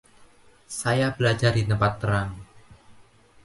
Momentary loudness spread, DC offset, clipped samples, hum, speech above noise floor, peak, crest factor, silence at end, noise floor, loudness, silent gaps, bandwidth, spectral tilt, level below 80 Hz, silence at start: 13 LU; under 0.1%; under 0.1%; none; 31 dB; -6 dBFS; 20 dB; 0.5 s; -54 dBFS; -24 LUFS; none; 11.5 kHz; -5.5 dB/octave; -48 dBFS; 0.7 s